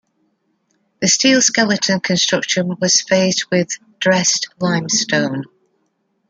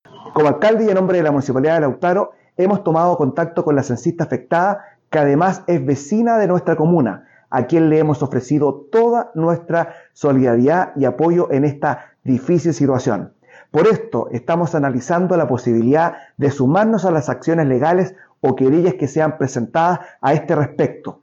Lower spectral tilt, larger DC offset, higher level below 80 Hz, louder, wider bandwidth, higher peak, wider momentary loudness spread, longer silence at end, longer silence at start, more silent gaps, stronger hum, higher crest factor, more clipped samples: second, -2.5 dB/octave vs -8 dB/octave; neither; about the same, -62 dBFS vs -58 dBFS; about the same, -15 LUFS vs -17 LUFS; first, 10 kHz vs 7.8 kHz; first, -2 dBFS vs -6 dBFS; about the same, 8 LU vs 7 LU; first, 0.85 s vs 0.1 s; first, 1 s vs 0.15 s; neither; neither; about the same, 16 dB vs 12 dB; neither